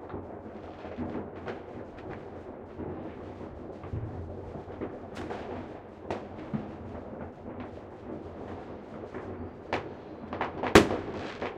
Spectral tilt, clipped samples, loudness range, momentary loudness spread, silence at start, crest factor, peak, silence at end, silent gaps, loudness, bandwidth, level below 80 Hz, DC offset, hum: -5.5 dB/octave; under 0.1%; 11 LU; 9 LU; 0 s; 34 dB; 0 dBFS; 0 s; none; -35 LUFS; 16 kHz; -52 dBFS; under 0.1%; none